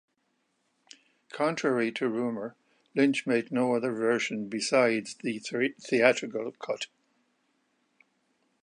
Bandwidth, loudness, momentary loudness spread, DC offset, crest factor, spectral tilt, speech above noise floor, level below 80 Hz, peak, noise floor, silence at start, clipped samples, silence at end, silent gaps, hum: 11 kHz; -28 LUFS; 11 LU; under 0.1%; 24 dB; -4.5 dB/octave; 48 dB; -82 dBFS; -6 dBFS; -75 dBFS; 1.35 s; under 0.1%; 1.75 s; none; none